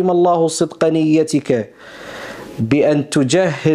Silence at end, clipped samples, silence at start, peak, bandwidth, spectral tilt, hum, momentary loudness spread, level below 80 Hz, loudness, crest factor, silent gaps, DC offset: 0 s; under 0.1%; 0 s; -2 dBFS; 13 kHz; -5.5 dB/octave; none; 17 LU; -54 dBFS; -16 LUFS; 12 dB; none; under 0.1%